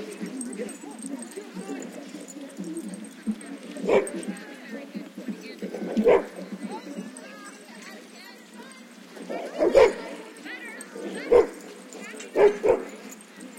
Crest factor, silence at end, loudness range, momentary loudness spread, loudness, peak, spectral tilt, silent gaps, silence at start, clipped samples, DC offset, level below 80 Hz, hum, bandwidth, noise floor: 24 dB; 0 s; 11 LU; 22 LU; -27 LUFS; -4 dBFS; -5 dB/octave; none; 0 s; under 0.1%; under 0.1%; -58 dBFS; none; 16.5 kHz; -46 dBFS